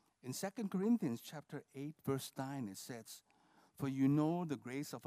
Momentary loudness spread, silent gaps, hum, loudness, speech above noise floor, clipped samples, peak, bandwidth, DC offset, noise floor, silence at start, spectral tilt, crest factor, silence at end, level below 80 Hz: 15 LU; none; none; -40 LUFS; 31 dB; under 0.1%; -24 dBFS; 15.5 kHz; under 0.1%; -71 dBFS; 0.25 s; -6.5 dB/octave; 18 dB; 0 s; -84 dBFS